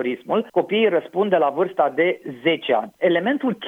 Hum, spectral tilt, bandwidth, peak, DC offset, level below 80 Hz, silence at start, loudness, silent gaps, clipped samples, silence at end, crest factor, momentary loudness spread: none; -7 dB/octave; 4.2 kHz; -4 dBFS; under 0.1%; -74 dBFS; 0 s; -21 LUFS; none; under 0.1%; 0 s; 16 dB; 4 LU